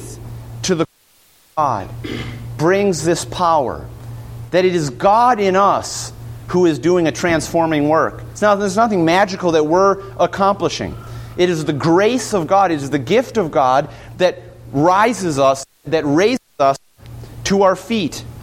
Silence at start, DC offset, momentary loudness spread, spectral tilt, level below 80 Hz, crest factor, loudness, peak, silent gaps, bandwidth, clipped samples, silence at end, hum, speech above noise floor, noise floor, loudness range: 0 s; under 0.1%; 14 LU; -5 dB/octave; -44 dBFS; 16 dB; -16 LUFS; -2 dBFS; none; 16 kHz; under 0.1%; 0 s; none; 37 dB; -53 dBFS; 3 LU